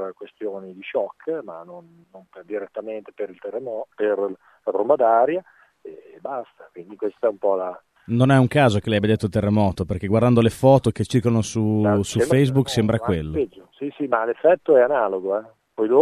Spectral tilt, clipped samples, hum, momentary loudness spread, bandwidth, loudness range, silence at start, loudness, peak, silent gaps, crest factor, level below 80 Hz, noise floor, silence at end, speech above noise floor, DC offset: -7 dB/octave; under 0.1%; none; 16 LU; 13.5 kHz; 11 LU; 0 s; -21 LUFS; -4 dBFS; none; 18 dB; -50 dBFS; -42 dBFS; 0 s; 22 dB; under 0.1%